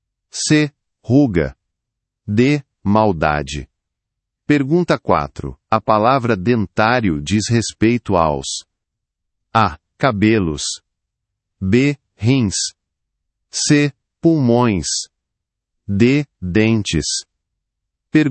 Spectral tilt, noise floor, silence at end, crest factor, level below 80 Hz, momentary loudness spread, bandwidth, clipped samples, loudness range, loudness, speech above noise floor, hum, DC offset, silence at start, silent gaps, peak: -5 dB/octave; -80 dBFS; 0 s; 18 dB; -42 dBFS; 10 LU; 8.8 kHz; under 0.1%; 3 LU; -17 LUFS; 64 dB; none; under 0.1%; 0.35 s; none; 0 dBFS